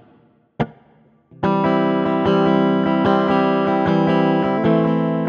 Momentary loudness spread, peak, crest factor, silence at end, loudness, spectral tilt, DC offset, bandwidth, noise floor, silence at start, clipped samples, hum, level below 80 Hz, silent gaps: 8 LU; -2 dBFS; 16 dB; 0 s; -18 LUFS; -9 dB/octave; under 0.1%; 6.8 kHz; -54 dBFS; 0.6 s; under 0.1%; none; -52 dBFS; none